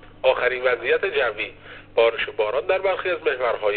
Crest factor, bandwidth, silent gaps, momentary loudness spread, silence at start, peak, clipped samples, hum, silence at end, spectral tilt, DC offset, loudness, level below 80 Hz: 16 dB; 4.6 kHz; none; 6 LU; 0 s; -6 dBFS; under 0.1%; none; 0 s; -0.5 dB/octave; 0.1%; -22 LUFS; -52 dBFS